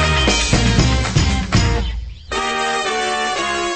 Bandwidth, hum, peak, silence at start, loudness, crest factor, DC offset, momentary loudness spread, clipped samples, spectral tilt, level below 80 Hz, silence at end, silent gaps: 8.8 kHz; none; -4 dBFS; 0 s; -17 LUFS; 14 dB; under 0.1%; 8 LU; under 0.1%; -4 dB/octave; -24 dBFS; 0 s; none